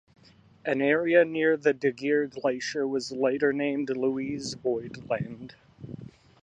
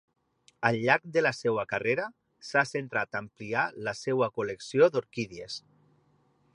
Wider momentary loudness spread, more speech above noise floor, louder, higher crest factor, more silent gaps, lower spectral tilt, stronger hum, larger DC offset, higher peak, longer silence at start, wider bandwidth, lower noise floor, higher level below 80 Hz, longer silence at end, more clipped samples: first, 20 LU vs 13 LU; second, 27 dB vs 39 dB; about the same, -27 LUFS vs -29 LUFS; about the same, 20 dB vs 24 dB; neither; about the same, -5.5 dB/octave vs -5 dB/octave; neither; neither; about the same, -8 dBFS vs -6 dBFS; about the same, 0.65 s vs 0.6 s; second, 9.4 kHz vs 11 kHz; second, -53 dBFS vs -68 dBFS; about the same, -66 dBFS vs -70 dBFS; second, 0.3 s vs 0.95 s; neither